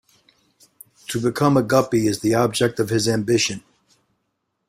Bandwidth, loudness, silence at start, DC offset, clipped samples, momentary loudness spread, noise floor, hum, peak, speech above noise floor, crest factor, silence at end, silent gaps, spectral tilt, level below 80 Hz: 16 kHz; -20 LUFS; 1.1 s; under 0.1%; under 0.1%; 7 LU; -74 dBFS; none; -2 dBFS; 55 dB; 20 dB; 1.1 s; none; -5 dB/octave; -56 dBFS